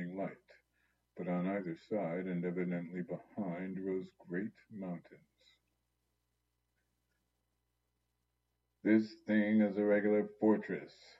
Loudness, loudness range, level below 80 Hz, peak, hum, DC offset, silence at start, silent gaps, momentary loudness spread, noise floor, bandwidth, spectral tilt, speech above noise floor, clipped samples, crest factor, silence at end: -36 LUFS; 15 LU; -84 dBFS; -18 dBFS; 60 Hz at -75 dBFS; under 0.1%; 0 s; none; 14 LU; -84 dBFS; 7.2 kHz; -9.5 dB/octave; 48 dB; under 0.1%; 20 dB; 0.3 s